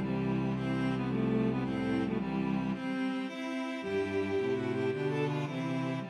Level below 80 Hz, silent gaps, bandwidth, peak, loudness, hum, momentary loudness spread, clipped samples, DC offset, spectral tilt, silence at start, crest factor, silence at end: -58 dBFS; none; 10.5 kHz; -20 dBFS; -33 LUFS; none; 4 LU; under 0.1%; under 0.1%; -7.5 dB/octave; 0 s; 12 dB; 0 s